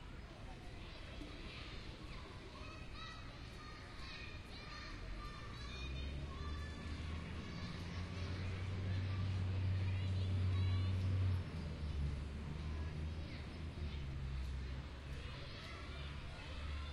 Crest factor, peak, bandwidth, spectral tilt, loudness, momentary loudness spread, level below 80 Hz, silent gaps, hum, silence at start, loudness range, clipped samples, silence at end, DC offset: 14 dB; -30 dBFS; 10.5 kHz; -6.5 dB/octave; -45 LUFS; 13 LU; -50 dBFS; none; none; 0 s; 11 LU; under 0.1%; 0 s; under 0.1%